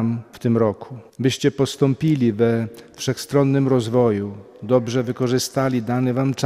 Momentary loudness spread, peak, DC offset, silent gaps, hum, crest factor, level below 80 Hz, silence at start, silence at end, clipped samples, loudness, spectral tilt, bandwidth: 8 LU; -4 dBFS; under 0.1%; none; none; 16 dB; -58 dBFS; 0 s; 0 s; under 0.1%; -20 LUFS; -6.5 dB/octave; 15.5 kHz